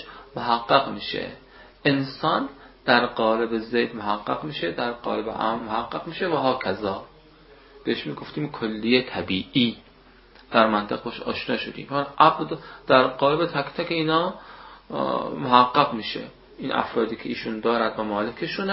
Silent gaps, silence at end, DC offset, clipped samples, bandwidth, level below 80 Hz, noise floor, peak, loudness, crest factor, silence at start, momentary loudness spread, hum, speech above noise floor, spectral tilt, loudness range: none; 0 s; under 0.1%; under 0.1%; 5.8 kHz; -56 dBFS; -52 dBFS; 0 dBFS; -24 LUFS; 24 dB; 0 s; 12 LU; none; 28 dB; -9.5 dB/octave; 5 LU